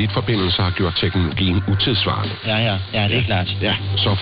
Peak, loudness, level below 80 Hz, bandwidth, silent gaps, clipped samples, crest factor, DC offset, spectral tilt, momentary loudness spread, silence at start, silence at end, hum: -8 dBFS; -19 LUFS; -40 dBFS; 5.2 kHz; none; under 0.1%; 12 dB; under 0.1%; -4 dB/octave; 3 LU; 0 s; 0 s; none